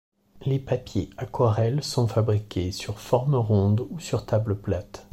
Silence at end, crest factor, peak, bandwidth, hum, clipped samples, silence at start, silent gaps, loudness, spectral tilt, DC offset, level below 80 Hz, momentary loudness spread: 0.1 s; 18 dB; -8 dBFS; 14 kHz; none; under 0.1%; 0.35 s; none; -26 LUFS; -7 dB/octave; under 0.1%; -50 dBFS; 9 LU